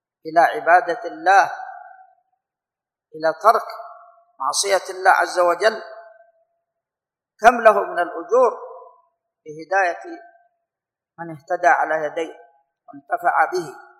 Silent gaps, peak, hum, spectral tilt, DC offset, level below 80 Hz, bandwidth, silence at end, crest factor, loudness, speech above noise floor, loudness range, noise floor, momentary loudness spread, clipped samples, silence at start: none; 0 dBFS; none; -2 dB/octave; under 0.1%; -64 dBFS; 14.5 kHz; 0.2 s; 22 dB; -18 LUFS; 70 dB; 5 LU; -89 dBFS; 21 LU; under 0.1%; 0.25 s